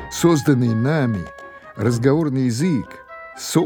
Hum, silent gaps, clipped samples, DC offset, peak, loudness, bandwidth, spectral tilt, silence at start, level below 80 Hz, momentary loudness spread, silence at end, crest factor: none; none; under 0.1%; under 0.1%; -2 dBFS; -19 LUFS; 20 kHz; -6.5 dB/octave; 0 s; -50 dBFS; 20 LU; 0 s; 16 dB